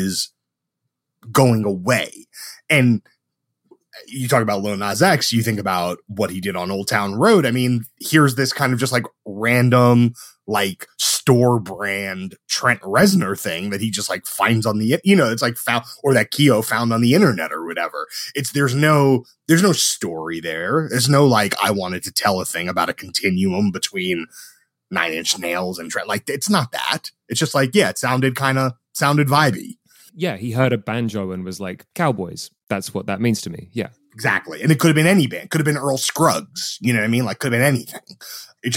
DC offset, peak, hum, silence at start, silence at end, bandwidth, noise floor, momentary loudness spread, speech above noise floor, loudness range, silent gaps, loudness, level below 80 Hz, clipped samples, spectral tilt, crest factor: under 0.1%; -2 dBFS; none; 0 s; 0 s; 17 kHz; -79 dBFS; 11 LU; 60 dB; 5 LU; 32.63-32.67 s; -19 LUFS; -62 dBFS; under 0.1%; -4.5 dB/octave; 18 dB